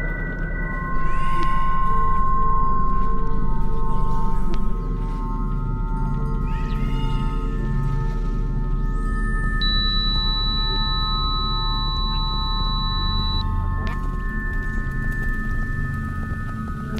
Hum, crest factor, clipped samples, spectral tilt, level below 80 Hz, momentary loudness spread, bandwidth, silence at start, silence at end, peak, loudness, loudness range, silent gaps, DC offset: none; 12 dB; under 0.1%; -6.5 dB/octave; -22 dBFS; 6 LU; 4.9 kHz; 0 s; 0 s; -6 dBFS; -25 LUFS; 5 LU; none; under 0.1%